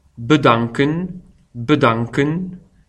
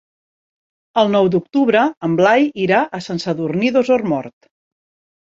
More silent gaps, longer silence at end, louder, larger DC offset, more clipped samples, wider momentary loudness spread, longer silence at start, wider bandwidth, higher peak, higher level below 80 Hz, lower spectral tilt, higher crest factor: second, none vs 1.97-2.01 s; second, 0.3 s vs 0.9 s; about the same, -17 LUFS vs -16 LUFS; neither; neither; first, 15 LU vs 9 LU; second, 0.2 s vs 0.95 s; first, 9.8 kHz vs 7.8 kHz; about the same, 0 dBFS vs -2 dBFS; first, -48 dBFS vs -60 dBFS; about the same, -7 dB/octave vs -6.5 dB/octave; about the same, 18 dB vs 16 dB